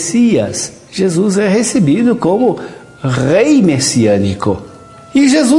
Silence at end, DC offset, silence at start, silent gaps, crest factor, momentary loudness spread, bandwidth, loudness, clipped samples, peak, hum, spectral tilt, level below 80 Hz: 0 s; under 0.1%; 0 s; none; 12 dB; 11 LU; 11.5 kHz; -12 LUFS; under 0.1%; 0 dBFS; none; -5 dB/octave; -48 dBFS